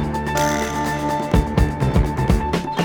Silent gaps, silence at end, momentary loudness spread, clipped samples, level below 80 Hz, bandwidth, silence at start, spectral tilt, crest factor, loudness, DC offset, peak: none; 0 s; 3 LU; under 0.1%; -26 dBFS; over 20 kHz; 0 s; -6 dB/octave; 16 dB; -20 LUFS; under 0.1%; -4 dBFS